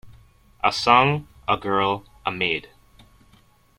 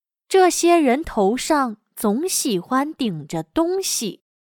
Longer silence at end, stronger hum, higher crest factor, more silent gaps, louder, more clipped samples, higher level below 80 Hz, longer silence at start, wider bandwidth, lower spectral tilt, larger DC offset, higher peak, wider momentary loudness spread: first, 1.2 s vs 0.3 s; neither; first, 22 dB vs 16 dB; neither; about the same, -22 LUFS vs -20 LUFS; neither; about the same, -54 dBFS vs -50 dBFS; second, 0.05 s vs 0.3 s; second, 16 kHz vs 19 kHz; first, -5 dB/octave vs -3.5 dB/octave; neither; about the same, -4 dBFS vs -4 dBFS; about the same, 11 LU vs 10 LU